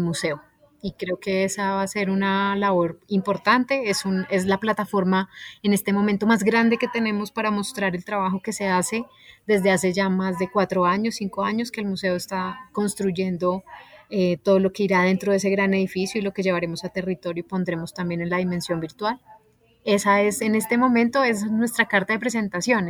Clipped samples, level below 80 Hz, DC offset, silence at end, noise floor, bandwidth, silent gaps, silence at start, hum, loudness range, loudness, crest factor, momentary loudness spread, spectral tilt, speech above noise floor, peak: under 0.1%; -60 dBFS; under 0.1%; 0 s; -57 dBFS; 18 kHz; none; 0 s; none; 4 LU; -23 LUFS; 18 dB; 9 LU; -5 dB/octave; 34 dB; -4 dBFS